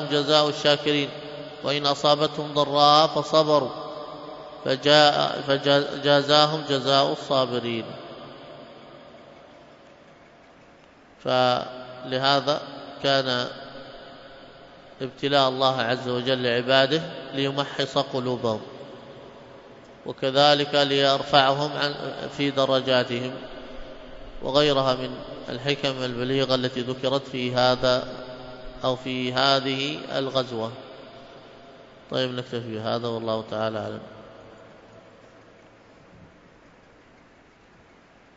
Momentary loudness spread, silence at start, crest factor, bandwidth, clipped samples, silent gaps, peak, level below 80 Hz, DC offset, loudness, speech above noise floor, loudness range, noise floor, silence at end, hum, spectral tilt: 21 LU; 0 s; 24 dB; 7.8 kHz; under 0.1%; none; -2 dBFS; -56 dBFS; under 0.1%; -23 LUFS; 31 dB; 10 LU; -54 dBFS; 2.1 s; none; -4.5 dB/octave